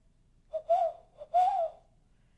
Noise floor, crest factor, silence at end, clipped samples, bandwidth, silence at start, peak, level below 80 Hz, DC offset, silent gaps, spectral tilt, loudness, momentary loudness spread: -65 dBFS; 14 dB; 0.65 s; under 0.1%; 8.8 kHz; 0.55 s; -18 dBFS; -66 dBFS; under 0.1%; none; -3.5 dB/octave; -31 LUFS; 14 LU